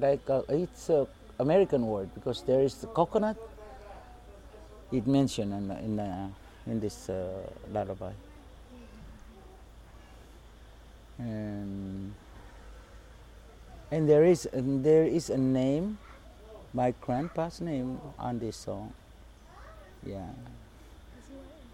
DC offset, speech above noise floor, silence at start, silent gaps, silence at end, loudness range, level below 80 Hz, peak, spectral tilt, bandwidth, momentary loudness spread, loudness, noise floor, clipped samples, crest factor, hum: under 0.1%; 23 dB; 0 s; none; 0.05 s; 15 LU; -52 dBFS; -12 dBFS; -7 dB/octave; 15.5 kHz; 26 LU; -30 LUFS; -52 dBFS; under 0.1%; 20 dB; none